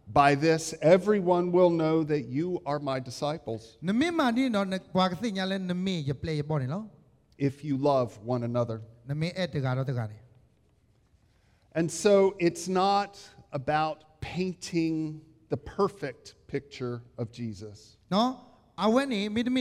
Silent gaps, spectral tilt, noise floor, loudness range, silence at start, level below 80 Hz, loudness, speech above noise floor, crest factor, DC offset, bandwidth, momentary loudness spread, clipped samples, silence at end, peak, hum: none; -6 dB/octave; -65 dBFS; 7 LU; 0.05 s; -60 dBFS; -28 LUFS; 38 dB; 20 dB; under 0.1%; 14 kHz; 15 LU; under 0.1%; 0 s; -8 dBFS; none